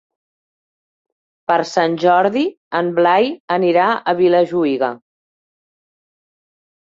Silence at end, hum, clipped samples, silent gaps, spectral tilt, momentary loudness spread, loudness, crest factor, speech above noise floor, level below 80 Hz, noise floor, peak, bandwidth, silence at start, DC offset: 1.85 s; none; under 0.1%; 2.57-2.71 s, 3.40-3.48 s; -6 dB/octave; 7 LU; -16 LUFS; 16 dB; over 75 dB; -66 dBFS; under -90 dBFS; -2 dBFS; 7.6 kHz; 1.5 s; under 0.1%